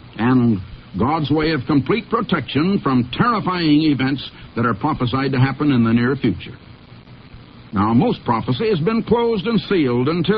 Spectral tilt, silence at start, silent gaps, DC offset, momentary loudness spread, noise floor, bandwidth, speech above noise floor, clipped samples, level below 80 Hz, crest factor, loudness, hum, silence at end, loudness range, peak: -10.5 dB/octave; 0.05 s; none; under 0.1%; 6 LU; -41 dBFS; 5.4 kHz; 24 dB; under 0.1%; -44 dBFS; 16 dB; -18 LUFS; none; 0 s; 2 LU; -2 dBFS